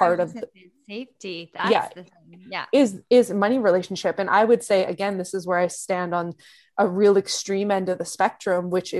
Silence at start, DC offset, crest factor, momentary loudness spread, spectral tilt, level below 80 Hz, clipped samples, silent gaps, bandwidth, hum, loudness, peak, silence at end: 0 s; under 0.1%; 18 dB; 16 LU; -4.5 dB/octave; -68 dBFS; under 0.1%; none; 12.5 kHz; none; -22 LUFS; -4 dBFS; 0 s